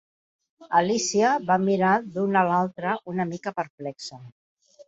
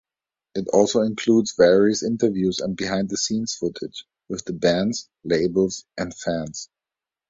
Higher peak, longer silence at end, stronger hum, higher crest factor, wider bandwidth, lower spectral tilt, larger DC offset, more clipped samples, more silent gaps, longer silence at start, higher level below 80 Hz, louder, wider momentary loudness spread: second, -6 dBFS vs -2 dBFS; about the same, 0.6 s vs 0.65 s; neither; about the same, 18 dB vs 20 dB; about the same, 8 kHz vs 7.8 kHz; about the same, -4.5 dB/octave vs -4.5 dB/octave; neither; neither; first, 3.70-3.78 s vs none; about the same, 0.6 s vs 0.55 s; second, -70 dBFS vs -54 dBFS; about the same, -24 LUFS vs -22 LUFS; second, 13 LU vs 16 LU